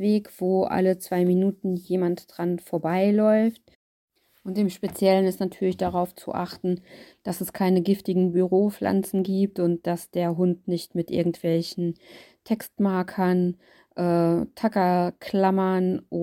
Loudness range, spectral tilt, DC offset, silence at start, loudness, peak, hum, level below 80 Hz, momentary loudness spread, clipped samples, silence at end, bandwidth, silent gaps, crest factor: 3 LU; -7.5 dB/octave; under 0.1%; 0 s; -24 LUFS; -8 dBFS; none; -62 dBFS; 9 LU; under 0.1%; 0 s; 17 kHz; 3.75-4.08 s; 16 dB